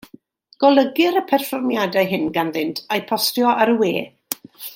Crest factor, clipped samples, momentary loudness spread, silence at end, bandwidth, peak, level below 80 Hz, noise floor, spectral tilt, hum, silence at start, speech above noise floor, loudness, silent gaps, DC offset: 18 dB; under 0.1%; 11 LU; 0 s; 17 kHz; -2 dBFS; -66 dBFS; -48 dBFS; -4 dB/octave; none; 0.6 s; 30 dB; -19 LUFS; none; under 0.1%